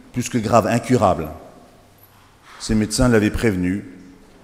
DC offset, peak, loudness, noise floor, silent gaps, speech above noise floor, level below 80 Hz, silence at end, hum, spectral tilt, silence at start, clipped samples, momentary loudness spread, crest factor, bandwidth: under 0.1%; 0 dBFS; -19 LUFS; -50 dBFS; none; 32 dB; -36 dBFS; 0.35 s; none; -5.5 dB/octave; 0.15 s; under 0.1%; 16 LU; 20 dB; 16 kHz